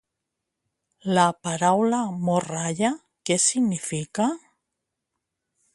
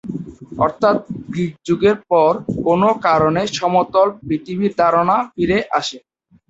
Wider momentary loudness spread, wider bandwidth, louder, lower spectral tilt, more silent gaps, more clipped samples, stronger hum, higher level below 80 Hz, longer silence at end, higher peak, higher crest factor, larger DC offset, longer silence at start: about the same, 8 LU vs 9 LU; first, 11.5 kHz vs 8 kHz; second, -23 LUFS vs -17 LUFS; second, -4 dB/octave vs -6 dB/octave; neither; neither; neither; second, -68 dBFS vs -48 dBFS; first, 1.35 s vs 0.5 s; about the same, -4 dBFS vs -2 dBFS; first, 22 dB vs 16 dB; neither; first, 1.05 s vs 0.05 s